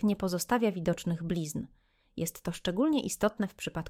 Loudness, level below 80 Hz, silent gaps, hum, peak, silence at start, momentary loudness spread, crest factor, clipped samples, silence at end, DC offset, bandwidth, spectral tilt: -32 LUFS; -56 dBFS; none; none; -14 dBFS; 0 s; 9 LU; 18 dB; under 0.1%; 0 s; under 0.1%; 19 kHz; -5.5 dB/octave